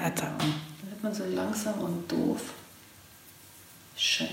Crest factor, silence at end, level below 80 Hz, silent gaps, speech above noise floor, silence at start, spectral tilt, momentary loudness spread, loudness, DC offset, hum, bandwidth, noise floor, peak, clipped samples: 18 dB; 0 s; -68 dBFS; none; 23 dB; 0 s; -4 dB/octave; 21 LU; -31 LUFS; under 0.1%; none; 16.5 kHz; -53 dBFS; -14 dBFS; under 0.1%